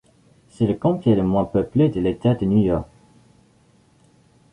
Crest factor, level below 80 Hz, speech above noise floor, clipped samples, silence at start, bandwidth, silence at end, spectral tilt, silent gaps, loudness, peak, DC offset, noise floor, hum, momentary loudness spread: 16 dB; -44 dBFS; 38 dB; under 0.1%; 0.6 s; 10 kHz; 1.7 s; -9.5 dB/octave; none; -20 LUFS; -6 dBFS; under 0.1%; -57 dBFS; none; 5 LU